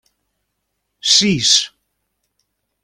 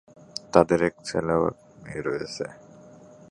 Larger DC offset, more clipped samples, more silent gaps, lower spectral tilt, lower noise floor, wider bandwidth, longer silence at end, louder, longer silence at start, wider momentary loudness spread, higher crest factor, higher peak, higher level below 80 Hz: neither; neither; neither; second, -1.5 dB/octave vs -5.5 dB/octave; first, -73 dBFS vs -49 dBFS; first, 15.5 kHz vs 11.5 kHz; first, 1.15 s vs 0.8 s; first, -13 LUFS vs -25 LUFS; first, 1.05 s vs 0.55 s; second, 12 LU vs 18 LU; second, 20 dB vs 26 dB; about the same, 0 dBFS vs 0 dBFS; about the same, -56 dBFS vs -54 dBFS